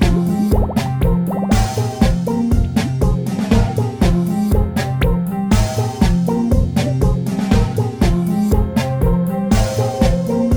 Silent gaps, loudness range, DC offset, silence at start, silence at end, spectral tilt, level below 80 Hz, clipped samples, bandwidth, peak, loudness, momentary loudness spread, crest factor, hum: none; 0 LU; 0.6%; 0 s; 0 s; -7 dB/octave; -22 dBFS; under 0.1%; over 20 kHz; 0 dBFS; -17 LUFS; 2 LU; 14 dB; none